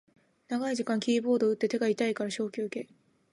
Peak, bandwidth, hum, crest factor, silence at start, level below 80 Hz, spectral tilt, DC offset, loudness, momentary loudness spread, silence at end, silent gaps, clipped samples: -14 dBFS; 11.5 kHz; none; 16 dB; 0.5 s; -80 dBFS; -5 dB/octave; under 0.1%; -30 LUFS; 9 LU; 0.5 s; none; under 0.1%